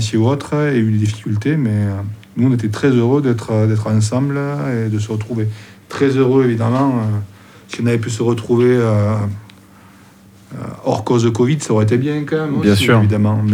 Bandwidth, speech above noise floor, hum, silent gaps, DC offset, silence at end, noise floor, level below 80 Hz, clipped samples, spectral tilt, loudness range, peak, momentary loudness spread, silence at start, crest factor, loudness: 14 kHz; 29 dB; none; none; under 0.1%; 0 s; -44 dBFS; -54 dBFS; under 0.1%; -7 dB/octave; 3 LU; 0 dBFS; 11 LU; 0 s; 14 dB; -16 LUFS